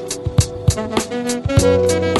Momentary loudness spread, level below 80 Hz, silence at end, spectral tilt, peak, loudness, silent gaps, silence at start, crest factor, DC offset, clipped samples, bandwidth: 7 LU; -30 dBFS; 0 s; -5 dB/octave; 0 dBFS; -17 LUFS; none; 0 s; 16 dB; under 0.1%; under 0.1%; 12 kHz